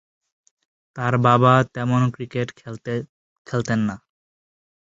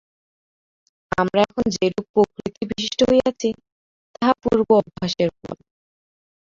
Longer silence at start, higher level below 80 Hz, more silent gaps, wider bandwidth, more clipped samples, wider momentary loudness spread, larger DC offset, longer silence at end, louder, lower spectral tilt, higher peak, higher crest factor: second, 0.95 s vs 1.2 s; about the same, -56 dBFS vs -52 dBFS; second, 3.09-3.45 s vs 2.09-2.14 s, 3.72-4.14 s; about the same, 7.8 kHz vs 7.8 kHz; neither; first, 18 LU vs 12 LU; neither; about the same, 0.9 s vs 0.95 s; about the same, -21 LUFS vs -21 LUFS; first, -7 dB/octave vs -5 dB/octave; about the same, -2 dBFS vs -2 dBFS; about the same, 20 dB vs 20 dB